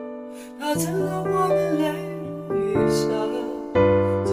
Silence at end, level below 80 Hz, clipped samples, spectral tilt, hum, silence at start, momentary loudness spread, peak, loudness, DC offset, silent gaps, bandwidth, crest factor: 0 s; -50 dBFS; under 0.1%; -6 dB/octave; none; 0 s; 12 LU; -8 dBFS; -23 LUFS; under 0.1%; none; 16 kHz; 16 dB